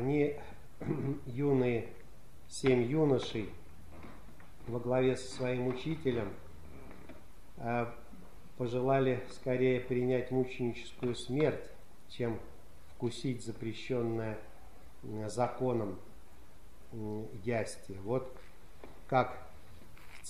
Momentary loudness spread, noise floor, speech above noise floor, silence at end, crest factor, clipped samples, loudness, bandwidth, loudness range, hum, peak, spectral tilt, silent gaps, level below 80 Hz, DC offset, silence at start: 23 LU; -58 dBFS; 24 dB; 0 s; 22 dB; under 0.1%; -35 LUFS; 14.5 kHz; 6 LU; none; -14 dBFS; -6.5 dB/octave; none; -58 dBFS; 0.6%; 0 s